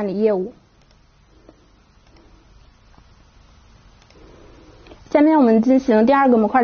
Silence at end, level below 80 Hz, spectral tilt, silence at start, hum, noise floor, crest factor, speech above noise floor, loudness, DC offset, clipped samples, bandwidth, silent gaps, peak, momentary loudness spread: 0 s; -52 dBFS; -6 dB/octave; 0 s; none; -53 dBFS; 16 dB; 38 dB; -15 LUFS; under 0.1%; under 0.1%; 6.6 kHz; none; -2 dBFS; 8 LU